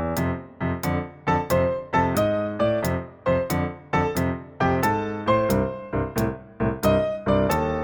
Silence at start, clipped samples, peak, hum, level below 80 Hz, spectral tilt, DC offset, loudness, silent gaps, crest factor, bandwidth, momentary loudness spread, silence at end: 0 s; under 0.1%; -8 dBFS; none; -40 dBFS; -6.5 dB/octave; under 0.1%; -24 LUFS; none; 16 dB; over 20 kHz; 6 LU; 0 s